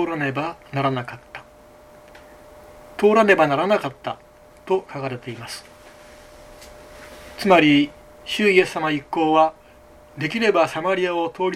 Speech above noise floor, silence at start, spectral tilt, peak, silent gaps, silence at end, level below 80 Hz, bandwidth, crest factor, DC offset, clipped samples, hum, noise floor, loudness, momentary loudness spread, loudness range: 28 dB; 0 s; -5.5 dB/octave; -2 dBFS; none; 0 s; -56 dBFS; 15 kHz; 20 dB; under 0.1%; under 0.1%; none; -48 dBFS; -20 LUFS; 22 LU; 9 LU